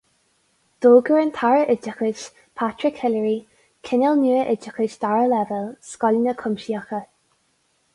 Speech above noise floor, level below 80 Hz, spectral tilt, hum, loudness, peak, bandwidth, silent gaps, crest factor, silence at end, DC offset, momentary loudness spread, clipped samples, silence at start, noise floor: 46 dB; -66 dBFS; -6 dB/octave; none; -21 LUFS; -4 dBFS; 11 kHz; none; 18 dB; 0.9 s; under 0.1%; 14 LU; under 0.1%; 0.8 s; -66 dBFS